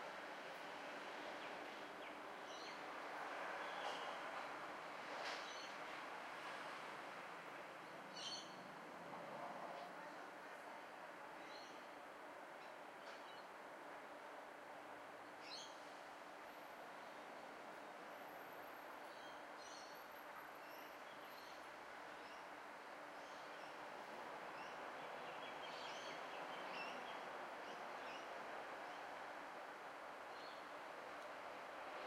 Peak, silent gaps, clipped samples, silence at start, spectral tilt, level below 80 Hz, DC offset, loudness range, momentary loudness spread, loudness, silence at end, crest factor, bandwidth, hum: -36 dBFS; none; under 0.1%; 0 s; -2.5 dB/octave; under -90 dBFS; under 0.1%; 6 LU; 7 LU; -53 LUFS; 0 s; 18 dB; 16 kHz; none